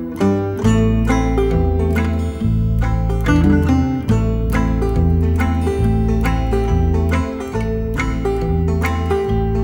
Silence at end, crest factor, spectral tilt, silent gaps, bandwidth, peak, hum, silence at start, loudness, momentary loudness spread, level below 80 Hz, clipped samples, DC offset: 0 s; 14 dB; -8 dB/octave; none; 16.5 kHz; -2 dBFS; none; 0 s; -17 LUFS; 5 LU; -22 dBFS; under 0.1%; under 0.1%